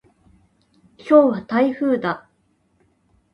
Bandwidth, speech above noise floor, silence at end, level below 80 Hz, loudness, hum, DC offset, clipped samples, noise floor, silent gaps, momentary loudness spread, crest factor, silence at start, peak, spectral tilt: 6.4 kHz; 47 dB; 1.15 s; -64 dBFS; -18 LUFS; none; under 0.1%; under 0.1%; -64 dBFS; none; 15 LU; 20 dB; 1.05 s; -2 dBFS; -8 dB/octave